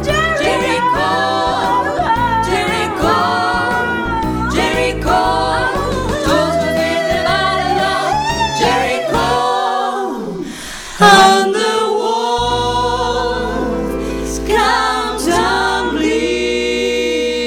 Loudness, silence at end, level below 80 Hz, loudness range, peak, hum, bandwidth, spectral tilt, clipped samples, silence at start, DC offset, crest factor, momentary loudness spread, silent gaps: -15 LUFS; 0 s; -32 dBFS; 3 LU; 0 dBFS; none; 19.5 kHz; -4 dB/octave; under 0.1%; 0 s; under 0.1%; 14 dB; 5 LU; none